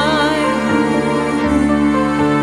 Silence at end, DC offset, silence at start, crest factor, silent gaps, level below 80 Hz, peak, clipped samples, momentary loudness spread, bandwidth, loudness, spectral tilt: 0 s; under 0.1%; 0 s; 12 dB; none; -36 dBFS; -2 dBFS; under 0.1%; 2 LU; 12 kHz; -15 LUFS; -5.5 dB/octave